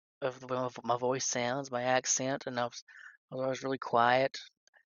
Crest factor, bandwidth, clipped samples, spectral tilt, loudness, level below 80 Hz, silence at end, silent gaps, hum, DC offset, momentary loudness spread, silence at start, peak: 22 dB; 7.2 kHz; under 0.1%; -3 dB/octave; -32 LUFS; -78 dBFS; 0.35 s; 2.82-2.87 s, 3.17-3.28 s; none; under 0.1%; 11 LU; 0.2 s; -12 dBFS